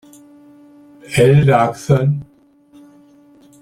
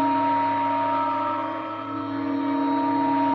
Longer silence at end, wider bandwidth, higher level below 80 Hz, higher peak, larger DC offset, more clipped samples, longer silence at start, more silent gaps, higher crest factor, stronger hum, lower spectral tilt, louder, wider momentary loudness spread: first, 1.4 s vs 0 s; first, 13 kHz vs 5.8 kHz; first, -46 dBFS vs -66 dBFS; first, -2 dBFS vs -12 dBFS; neither; neither; first, 1.1 s vs 0 s; neither; about the same, 16 dB vs 12 dB; neither; about the same, -7 dB/octave vs -8 dB/octave; first, -14 LUFS vs -24 LUFS; about the same, 10 LU vs 8 LU